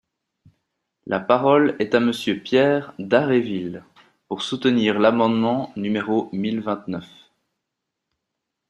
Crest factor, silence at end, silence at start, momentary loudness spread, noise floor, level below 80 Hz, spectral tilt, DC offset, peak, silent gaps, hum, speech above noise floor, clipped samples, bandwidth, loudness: 20 dB; 1.65 s; 1.05 s; 11 LU; -81 dBFS; -64 dBFS; -6.5 dB/octave; under 0.1%; -2 dBFS; none; none; 61 dB; under 0.1%; 12 kHz; -21 LUFS